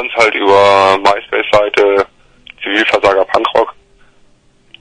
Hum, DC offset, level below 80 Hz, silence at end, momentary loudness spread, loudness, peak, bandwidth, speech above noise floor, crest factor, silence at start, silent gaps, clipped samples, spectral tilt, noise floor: none; under 0.1%; -48 dBFS; 1.1 s; 8 LU; -11 LUFS; 0 dBFS; 10 kHz; 39 dB; 12 dB; 0 s; none; 0.3%; -3.5 dB/octave; -50 dBFS